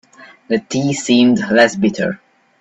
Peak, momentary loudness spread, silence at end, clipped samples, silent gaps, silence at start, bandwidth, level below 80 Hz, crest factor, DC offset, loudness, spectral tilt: 0 dBFS; 10 LU; 0.45 s; under 0.1%; none; 0.2 s; 8.4 kHz; -56 dBFS; 16 dB; under 0.1%; -15 LUFS; -4.5 dB/octave